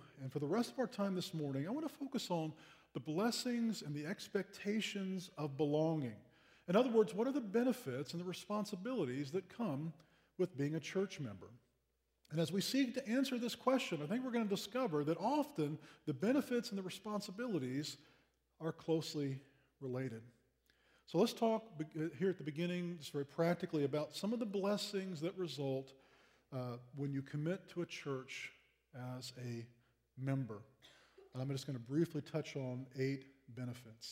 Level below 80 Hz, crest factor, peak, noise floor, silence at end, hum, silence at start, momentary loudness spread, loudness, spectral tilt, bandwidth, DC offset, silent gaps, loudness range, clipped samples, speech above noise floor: -82 dBFS; 20 dB; -20 dBFS; -83 dBFS; 0 s; none; 0 s; 11 LU; -40 LUFS; -6 dB/octave; 16 kHz; under 0.1%; none; 7 LU; under 0.1%; 43 dB